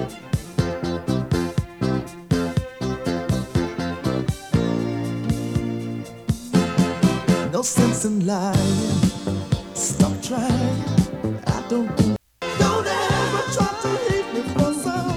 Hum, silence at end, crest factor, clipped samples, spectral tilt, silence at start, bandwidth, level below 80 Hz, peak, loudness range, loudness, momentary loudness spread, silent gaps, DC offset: none; 0 s; 18 dB; under 0.1%; -5.5 dB/octave; 0 s; 17 kHz; -40 dBFS; -4 dBFS; 4 LU; -22 LUFS; 7 LU; none; under 0.1%